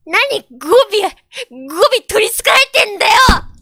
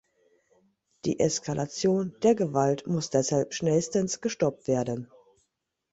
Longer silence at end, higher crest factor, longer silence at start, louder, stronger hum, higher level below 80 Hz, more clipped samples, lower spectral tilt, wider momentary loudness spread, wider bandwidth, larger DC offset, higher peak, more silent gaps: second, 0.15 s vs 0.9 s; second, 12 dB vs 18 dB; second, 0.05 s vs 1.05 s; first, -11 LUFS vs -27 LUFS; neither; first, -28 dBFS vs -62 dBFS; neither; second, -2.5 dB/octave vs -5.5 dB/octave; first, 16 LU vs 7 LU; first, 19 kHz vs 8.2 kHz; neither; first, 0 dBFS vs -10 dBFS; neither